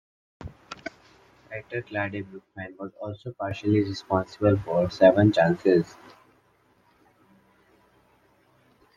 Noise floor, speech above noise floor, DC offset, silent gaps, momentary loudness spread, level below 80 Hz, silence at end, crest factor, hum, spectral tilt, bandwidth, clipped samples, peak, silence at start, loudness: -64 dBFS; 39 dB; under 0.1%; none; 22 LU; -58 dBFS; 3.1 s; 22 dB; none; -7.5 dB/octave; 7.6 kHz; under 0.1%; -4 dBFS; 0.4 s; -24 LUFS